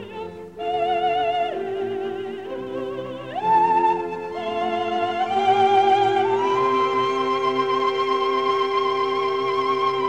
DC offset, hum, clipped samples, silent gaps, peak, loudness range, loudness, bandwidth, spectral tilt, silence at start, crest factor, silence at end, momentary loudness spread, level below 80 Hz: 0.2%; none; under 0.1%; none; -8 dBFS; 4 LU; -22 LUFS; 8.8 kHz; -5 dB/octave; 0 s; 14 dB; 0 s; 13 LU; -60 dBFS